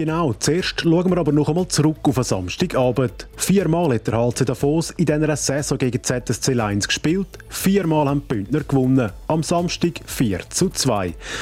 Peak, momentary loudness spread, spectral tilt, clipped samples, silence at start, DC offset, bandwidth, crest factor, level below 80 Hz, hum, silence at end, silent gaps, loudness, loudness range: -6 dBFS; 5 LU; -5 dB/octave; under 0.1%; 0 s; under 0.1%; 16.5 kHz; 14 dB; -42 dBFS; none; 0 s; none; -20 LUFS; 1 LU